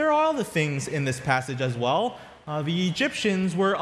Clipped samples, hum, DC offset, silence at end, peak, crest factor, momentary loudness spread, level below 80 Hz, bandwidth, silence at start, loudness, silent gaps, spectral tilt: under 0.1%; none; under 0.1%; 0 s; -6 dBFS; 18 dB; 6 LU; -60 dBFS; 14 kHz; 0 s; -25 LUFS; none; -5.5 dB/octave